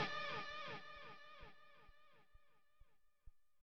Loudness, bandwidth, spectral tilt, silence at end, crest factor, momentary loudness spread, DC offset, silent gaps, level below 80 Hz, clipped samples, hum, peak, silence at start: -49 LUFS; 7.4 kHz; -1 dB/octave; 0.05 s; 22 dB; 22 LU; under 0.1%; none; -70 dBFS; under 0.1%; none; -30 dBFS; 0 s